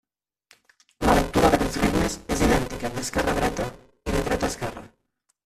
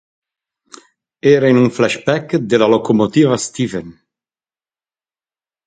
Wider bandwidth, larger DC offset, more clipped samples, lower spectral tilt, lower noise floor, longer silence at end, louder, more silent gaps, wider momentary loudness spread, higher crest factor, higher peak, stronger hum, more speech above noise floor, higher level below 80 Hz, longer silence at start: first, 15 kHz vs 9.4 kHz; neither; neither; about the same, -5 dB/octave vs -6 dB/octave; second, -73 dBFS vs under -90 dBFS; second, 0.6 s vs 1.75 s; second, -24 LUFS vs -14 LUFS; neither; first, 12 LU vs 9 LU; first, 22 dB vs 16 dB; second, -4 dBFS vs 0 dBFS; neither; second, 47 dB vs over 76 dB; first, -36 dBFS vs -56 dBFS; second, 1 s vs 1.25 s